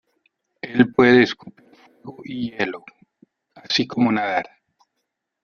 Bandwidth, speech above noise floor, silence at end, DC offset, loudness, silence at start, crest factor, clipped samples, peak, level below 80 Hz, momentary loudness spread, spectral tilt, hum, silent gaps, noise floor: 6.8 kHz; 57 dB; 1 s; under 0.1%; -19 LUFS; 0.65 s; 20 dB; under 0.1%; -2 dBFS; -60 dBFS; 24 LU; -5.5 dB/octave; none; none; -78 dBFS